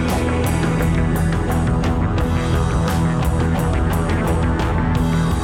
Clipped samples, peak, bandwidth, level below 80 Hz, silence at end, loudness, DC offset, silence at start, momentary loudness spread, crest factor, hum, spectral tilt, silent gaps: under 0.1%; -8 dBFS; 16.5 kHz; -24 dBFS; 0 s; -19 LUFS; under 0.1%; 0 s; 1 LU; 10 dB; none; -7 dB/octave; none